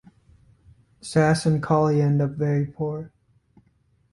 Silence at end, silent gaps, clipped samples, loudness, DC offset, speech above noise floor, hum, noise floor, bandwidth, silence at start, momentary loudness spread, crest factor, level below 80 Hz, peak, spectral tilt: 1.05 s; none; under 0.1%; -22 LUFS; under 0.1%; 42 dB; none; -64 dBFS; 11.5 kHz; 1.05 s; 14 LU; 16 dB; -56 dBFS; -8 dBFS; -7 dB/octave